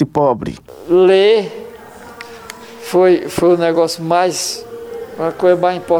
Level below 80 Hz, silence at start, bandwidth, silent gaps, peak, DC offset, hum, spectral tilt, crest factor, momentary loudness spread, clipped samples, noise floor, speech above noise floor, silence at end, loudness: -50 dBFS; 0 s; 17 kHz; none; -2 dBFS; under 0.1%; none; -5 dB/octave; 14 dB; 22 LU; under 0.1%; -35 dBFS; 22 dB; 0 s; -14 LUFS